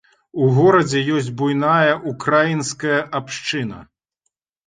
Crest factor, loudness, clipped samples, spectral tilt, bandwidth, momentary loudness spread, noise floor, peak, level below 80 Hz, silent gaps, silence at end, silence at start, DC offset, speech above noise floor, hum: 18 dB; -18 LUFS; under 0.1%; -5.5 dB/octave; 9.6 kHz; 11 LU; -75 dBFS; -2 dBFS; -56 dBFS; none; 0.8 s; 0.35 s; under 0.1%; 57 dB; none